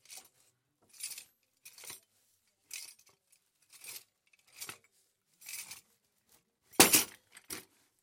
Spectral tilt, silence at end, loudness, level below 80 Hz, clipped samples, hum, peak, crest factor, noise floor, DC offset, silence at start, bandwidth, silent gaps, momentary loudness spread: -1 dB/octave; 0.4 s; -28 LUFS; -76 dBFS; under 0.1%; none; -4 dBFS; 34 dB; -75 dBFS; under 0.1%; 0.1 s; 16.5 kHz; none; 28 LU